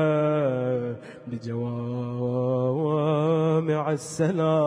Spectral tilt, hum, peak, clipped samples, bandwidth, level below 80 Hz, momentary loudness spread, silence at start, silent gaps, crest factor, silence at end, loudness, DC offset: -7.5 dB/octave; none; -10 dBFS; under 0.1%; 10.5 kHz; -66 dBFS; 10 LU; 0 s; none; 14 dB; 0 s; -25 LUFS; under 0.1%